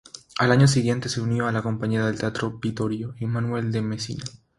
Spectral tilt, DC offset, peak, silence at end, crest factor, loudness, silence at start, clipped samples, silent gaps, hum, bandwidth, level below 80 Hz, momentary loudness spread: -6 dB/octave; under 0.1%; -4 dBFS; 0.25 s; 20 dB; -24 LUFS; 0.15 s; under 0.1%; none; none; 11.5 kHz; -54 dBFS; 11 LU